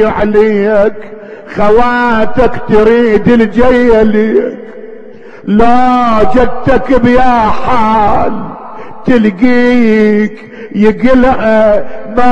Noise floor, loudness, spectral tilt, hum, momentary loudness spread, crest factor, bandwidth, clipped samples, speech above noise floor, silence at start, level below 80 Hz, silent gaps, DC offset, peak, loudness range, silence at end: -31 dBFS; -9 LUFS; -7.5 dB/octave; none; 15 LU; 8 dB; 8.4 kHz; 3%; 24 dB; 0 s; -26 dBFS; none; under 0.1%; 0 dBFS; 2 LU; 0 s